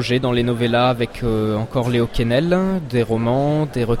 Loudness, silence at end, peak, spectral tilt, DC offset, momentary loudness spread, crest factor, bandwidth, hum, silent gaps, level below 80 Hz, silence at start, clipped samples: -19 LUFS; 0 s; -4 dBFS; -7 dB/octave; under 0.1%; 4 LU; 14 dB; 13.5 kHz; none; none; -34 dBFS; 0 s; under 0.1%